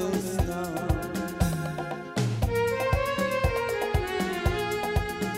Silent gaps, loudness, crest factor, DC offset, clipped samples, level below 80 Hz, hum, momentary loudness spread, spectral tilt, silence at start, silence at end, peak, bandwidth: none; -28 LUFS; 18 dB; under 0.1%; under 0.1%; -36 dBFS; none; 5 LU; -5.5 dB/octave; 0 s; 0 s; -10 dBFS; 16 kHz